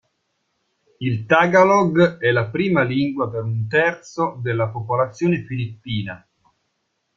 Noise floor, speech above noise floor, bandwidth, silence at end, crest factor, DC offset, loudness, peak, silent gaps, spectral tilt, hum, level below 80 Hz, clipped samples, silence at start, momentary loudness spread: -72 dBFS; 53 dB; 7.4 kHz; 1 s; 18 dB; under 0.1%; -19 LUFS; -2 dBFS; none; -7 dB/octave; none; -56 dBFS; under 0.1%; 1 s; 13 LU